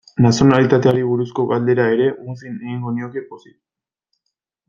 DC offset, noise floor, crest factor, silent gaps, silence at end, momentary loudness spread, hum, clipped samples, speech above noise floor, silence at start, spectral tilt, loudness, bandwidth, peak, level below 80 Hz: under 0.1%; -77 dBFS; 18 dB; none; 1.3 s; 17 LU; none; under 0.1%; 60 dB; 0.15 s; -7 dB/octave; -16 LUFS; 7.4 kHz; 0 dBFS; -52 dBFS